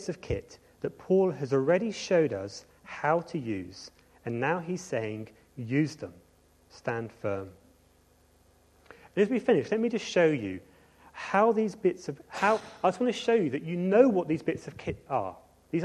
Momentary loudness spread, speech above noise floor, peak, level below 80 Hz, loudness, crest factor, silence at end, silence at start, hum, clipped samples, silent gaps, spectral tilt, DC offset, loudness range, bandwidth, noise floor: 17 LU; 35 dB; -8 dBFS; -58 dBFS; -29 LUFS; 22 dB; 0 s; 0 s; none; under 0.1%; none; -6 dB/octave; under 0.1%; 8 LU; 12 kHz; -63 dBFS